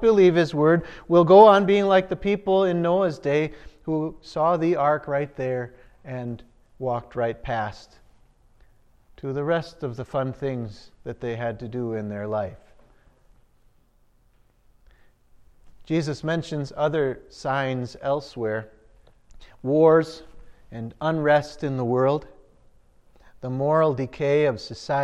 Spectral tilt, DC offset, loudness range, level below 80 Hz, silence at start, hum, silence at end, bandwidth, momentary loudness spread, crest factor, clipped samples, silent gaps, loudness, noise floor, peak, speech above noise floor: -7.5 dB/octave; under 0.1%; 14 LU; -52 dBFS; 0 s; none; 0 s; 9.6 kHz; 16 LU; 22 dB; under 0.1%; none; -23 LUFS; -60 dBFS; -2 dBFS; 38 dB